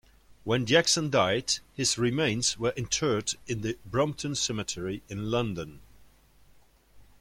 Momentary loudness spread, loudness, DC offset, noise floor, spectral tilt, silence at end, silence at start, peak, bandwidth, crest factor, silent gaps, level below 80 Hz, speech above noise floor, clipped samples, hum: 11 LU; -28 LUFS; under 0.1%; -60 dBFS; -3.5 dB/octave; 0.2 s; 0.45 s; -8 dBFS; 16.5 kHz; 22 dB; none; -56 dBFS; 31 dB; under 0.1%; none